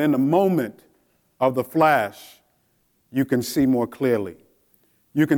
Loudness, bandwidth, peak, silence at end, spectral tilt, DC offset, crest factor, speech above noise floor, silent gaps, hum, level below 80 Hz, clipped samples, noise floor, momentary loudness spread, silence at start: -22 LUFS; 19.5 kHz; -6 dBFS; 0 s; -6.5 dB/octave; under 0.1%; 18 dB; 46 dB; none; none; -62 dBFS; under 0.1%; -66 dBFS; 11 LU; 0 s